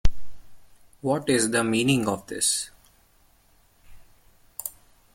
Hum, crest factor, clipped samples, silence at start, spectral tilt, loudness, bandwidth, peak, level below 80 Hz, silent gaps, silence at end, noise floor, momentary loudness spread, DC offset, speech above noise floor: none; 20 dB; under 0.1%; 0.05 s; -3.5 dB/octave; -25 LUFS; 16.5 kHz; -6 dBFS; -38 dBFS; none; 0.45 s; -60 dBFS; 14 LU; under 0.1%; 36 dB